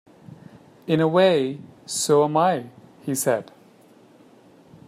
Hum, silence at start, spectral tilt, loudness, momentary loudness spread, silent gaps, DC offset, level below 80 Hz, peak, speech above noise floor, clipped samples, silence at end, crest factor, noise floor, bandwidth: none; 0.3 s; -4.5 dB/octave; -21 LUFS; 19 LU; none; under 0.1%; -70 dBFS; -6 dBFS; 32 dB; under 0.1%; 1.45 s; 18 dB; -52 dBFS; 16 kHz